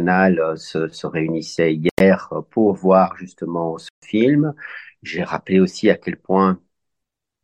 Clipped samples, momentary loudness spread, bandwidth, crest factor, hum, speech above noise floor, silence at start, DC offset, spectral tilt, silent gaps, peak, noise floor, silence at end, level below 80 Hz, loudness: under 0.1%; 12 LU; 9.2 kHz; 18 dB; none; 64 dB; 0 s; under 0.1%; -7 dB/octave; 1.91-1.97 s, 3.90-4.02 s; 0 dBFS; -82 dBFS; 0.85 s; -56 dBFS; -19 LUFS